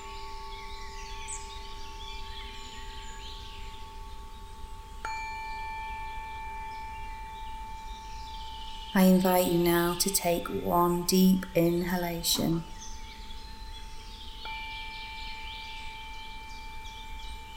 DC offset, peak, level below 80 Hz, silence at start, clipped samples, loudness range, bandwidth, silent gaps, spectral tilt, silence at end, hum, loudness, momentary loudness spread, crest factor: under 0.1%; -12 dBFS; -44 dBFS; 0 s; under 0.1%; 16 LU; 17.5 kHz; none; -4.5 dB/octave; 0 s; none; -30 LUFS; 20 LU; 20 dB